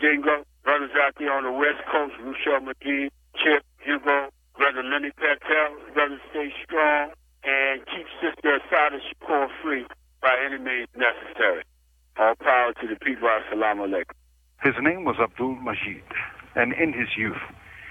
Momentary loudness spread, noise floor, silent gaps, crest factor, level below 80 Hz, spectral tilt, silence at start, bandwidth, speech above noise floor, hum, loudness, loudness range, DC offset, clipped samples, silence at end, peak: 10 LU; -61 dBFS; none; 20 dB; -58 dBFS; -6 dB/octave; 0 s; 9 kHz; 36 dB; none; -24 LUFS; 2 LU; under 0.1%; under 0.1%; 0 s; -6 dBFS